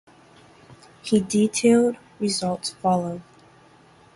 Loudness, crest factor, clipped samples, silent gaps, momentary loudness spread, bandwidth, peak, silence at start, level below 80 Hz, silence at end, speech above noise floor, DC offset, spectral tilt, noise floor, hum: -22 LUFS; 18 dB; under 0.1%; none; 13 LU; 11.5 kHz; -6 dBFS; 0.7 s; -62 dBFS; 0.95 s; 32 dB; under 0.1%; -5 dB/octave; -53 dBFS; none